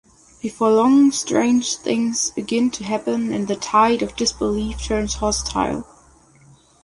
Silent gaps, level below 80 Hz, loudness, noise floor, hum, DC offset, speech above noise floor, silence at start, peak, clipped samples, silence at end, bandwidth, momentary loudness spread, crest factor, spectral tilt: none; -40 dBFS; -19 LUFS; -51 dBFS; none; under 0.1%; 32 dB; 0.45 s; -4 dBFS; under 0.1%; 1 s; 11.5 kHz; 9 LU; 16 dB; -4 dB/octave